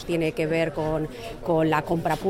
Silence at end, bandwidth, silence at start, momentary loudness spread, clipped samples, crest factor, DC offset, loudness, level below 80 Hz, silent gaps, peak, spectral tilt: 0 s; 16.5 kHz; 0 s; 8 LU; under 0.1%; 14 dB; under 0.1%; -25 LUFS; -44 dBFS; none; -10 dBFS; -6.5 dB/octave